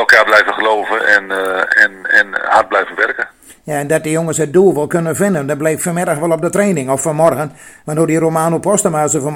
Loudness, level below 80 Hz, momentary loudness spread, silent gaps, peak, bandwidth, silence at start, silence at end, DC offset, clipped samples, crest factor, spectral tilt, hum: -13 LUFS; -54 dBFS; 7 LU; none; 0 dBFS; 17.5 kHz; 0 s; 0 s; under 0.1%; 0.3%; 14 dB; -4.5 dB/octave; none